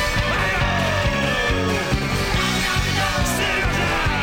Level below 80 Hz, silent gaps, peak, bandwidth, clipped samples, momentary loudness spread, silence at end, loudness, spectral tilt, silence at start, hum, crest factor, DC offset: -28 dBFS; none; -10 dBFS; 17 kHz; under 0.1%; 2 LU; 0 s; -20 LUFS; -4 dB/octave; 0 s; none; 10 dB; under 0.1%